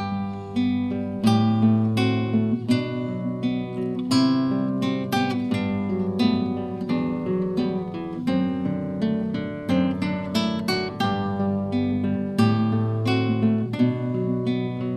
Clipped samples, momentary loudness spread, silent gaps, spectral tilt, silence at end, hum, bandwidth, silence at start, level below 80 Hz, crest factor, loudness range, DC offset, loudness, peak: under 0.1%; 7 LU; none; -7 dB/octave; 0 s; none; 13.5 kHz; 0 s; -56 dBFS; 16 dB; 3 LU; under 0.1%; -24 LUFS; -6 dBFS